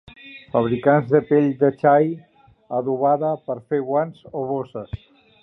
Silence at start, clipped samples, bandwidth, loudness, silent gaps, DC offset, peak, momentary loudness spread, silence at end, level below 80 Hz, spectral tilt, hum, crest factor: 0.25 s; under 0.1%; 4.2 kHz; -20 LUFS; none; under 0.1%; -2 dBFS; 17 LU; 0.45 s; -54 dBFS; -10.5 dB/octave; none; 18 dB